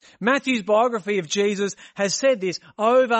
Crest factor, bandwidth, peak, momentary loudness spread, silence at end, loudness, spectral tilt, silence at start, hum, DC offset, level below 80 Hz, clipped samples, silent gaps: 14 dB; 8.6 kHz; -6 dBFS; 7 LU; 0 s; -22 LUFS; -3.5 dB/octave; 0.2 s; none; under 0.1%; -72 dBFS; under 0.1%; none